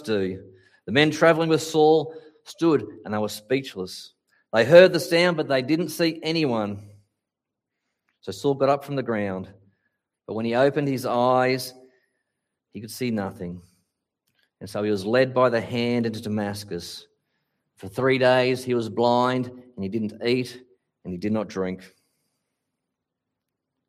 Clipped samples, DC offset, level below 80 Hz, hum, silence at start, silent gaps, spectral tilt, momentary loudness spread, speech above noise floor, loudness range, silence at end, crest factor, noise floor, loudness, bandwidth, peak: under 0.1%; under 0.1%; -68 dBFS; none; 0 s; none; -5.5 dB/octave; 18 LU; 63 dB; 9 LU; 2 s; 24 dB; -85 dBFS; -23 LUFS; 15.5 kHz; 0 dBFS